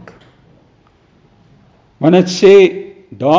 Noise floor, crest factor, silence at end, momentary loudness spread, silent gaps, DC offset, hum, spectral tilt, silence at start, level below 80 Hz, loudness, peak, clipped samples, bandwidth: -51 dBFS; 14 dB; 0 s; 20 LU; none; under 0.1%; none; -6 dB/octave; 2 s; -56 dBFS; -10 LUFS; 0 dBFS; under 0.1%; 7.6 kHz